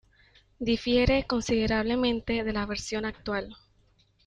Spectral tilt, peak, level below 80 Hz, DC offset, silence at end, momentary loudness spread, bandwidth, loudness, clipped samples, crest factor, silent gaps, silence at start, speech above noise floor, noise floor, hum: -5 dB/octave; -10 dBFS; -44 dBFS; under 0.1%; 0.7 s; 9 LU; 10 kHz; -28 LUFS; under 0.1%; 18 dB; none; 0.6 s; 38 dB; -65 dBFS; none